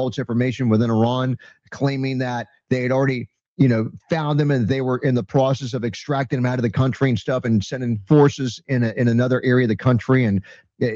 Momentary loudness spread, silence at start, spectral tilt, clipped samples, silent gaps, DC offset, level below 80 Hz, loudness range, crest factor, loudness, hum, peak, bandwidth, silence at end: 8 LU; 0 s; -7.5 dB/octave; under 0.1%; 3.48-3.56 s; under 0.1%; -56 dBFS; 3 LU; 16 dB; -20 LUFS; none; -4 dBFS; 7.4 kHz; 0 s